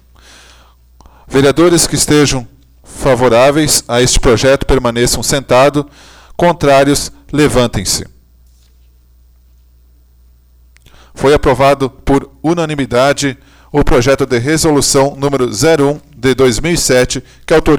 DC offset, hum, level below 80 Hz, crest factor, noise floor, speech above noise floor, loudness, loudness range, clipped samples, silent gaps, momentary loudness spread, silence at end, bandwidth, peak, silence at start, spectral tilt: under 0.1%; 60 Hz at -40 dBFS; -26 dBFS; 12 dB; -45 dBFS; 35 dB; -11 LUFS; 7 LU; under 0.1%; none; 7 LU; 0 s; over 20 kHz; 0 dBFS; 1.3 s; -4 dB/octave